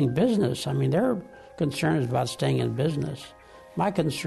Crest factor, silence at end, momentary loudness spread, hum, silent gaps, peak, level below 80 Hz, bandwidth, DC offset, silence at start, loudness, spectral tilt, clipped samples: 14 dB; 0 s; 12 LU; none; none; -12 dBFS; -56 dBFS; 12.5 kHz; under 0.1%; 0 s; -26 LUFS; -6.5 dB/octave; under 0.1%